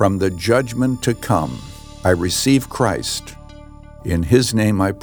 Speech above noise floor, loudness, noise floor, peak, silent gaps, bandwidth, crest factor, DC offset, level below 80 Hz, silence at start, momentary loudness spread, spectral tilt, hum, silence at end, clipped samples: 21 dB; -18 LUFS; -38 dBFS; -2 dBFS; none; over 20 kHz; 16 dB; under 0.1%; -40 dBFS; 0 s; 11 LU; -5 dB/octave; none; 0 s; under 0.1%